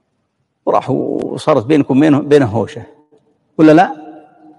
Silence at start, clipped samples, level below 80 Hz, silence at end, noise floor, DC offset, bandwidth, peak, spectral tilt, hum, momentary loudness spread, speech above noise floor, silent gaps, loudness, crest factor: 0.65 s; 0.3%; -56 dBFS; 0.45 s; -66 dBFS; under 0.1%; 11 kHz; 0 dBFS; -7.5 dB/octave; none; 15 LU; 55 dB; none; -13 LUFS; 14 dB